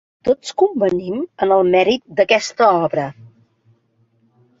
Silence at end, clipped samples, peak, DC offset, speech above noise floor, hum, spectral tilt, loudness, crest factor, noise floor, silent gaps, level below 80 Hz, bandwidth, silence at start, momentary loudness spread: 1.35 s; under 0.1%; -2 dBFS; under 0.1%; 44 dB; none; -5 dB/octave; -17 LUFS; 16 dB; -61 dBFS; none; -56 dBFS; 7.8 kHz; 0.25 s; 8 LU